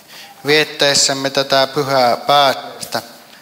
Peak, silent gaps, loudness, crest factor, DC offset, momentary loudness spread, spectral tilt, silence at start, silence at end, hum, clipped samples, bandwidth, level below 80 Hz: 0 dBFS; none; -14 LUFS; 16 dB; under 0.1%; 12 LU; -2 dB/octave; 0.1 s; 0.25 s; none; under 0.1%; 16.5 kHz; -58 dBFS